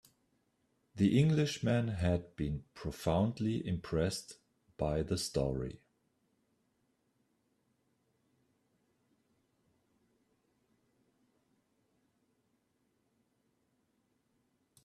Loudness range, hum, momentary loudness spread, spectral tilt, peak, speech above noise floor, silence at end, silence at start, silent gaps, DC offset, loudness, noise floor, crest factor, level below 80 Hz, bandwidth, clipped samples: 9 LU; none; 13 LU; -6.5 dB/octave; -18 dBFS; 45 dB; 9.1 s; 0.95 s; none; under 0.1%; -34 LUFS; -78 dBFS; 22 dB; -58 dBFS; 14 kHz; under 0.1%